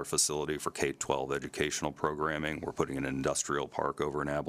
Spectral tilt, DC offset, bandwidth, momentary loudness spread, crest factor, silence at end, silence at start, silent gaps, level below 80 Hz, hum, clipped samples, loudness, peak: -3.5 dB/octave; under 0.1%; 15.5 kHz; 5 LU; 22 dB; 0 s; 0 s; none; -56 dBFS; none; under 0.1%; -33 LUFS; -12 dBFS